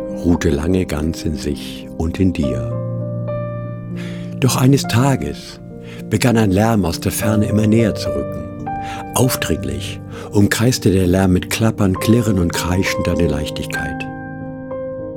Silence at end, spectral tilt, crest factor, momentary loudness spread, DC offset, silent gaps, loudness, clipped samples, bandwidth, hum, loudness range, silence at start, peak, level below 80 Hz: 0 s; -6 dB/octave; 16 dB; 13 LU; under 0.1%; none; -18 LUFS; under 0.1%; 18 kHz; none; 4 LU; 0 s; -2 dBFS; -36 dBFS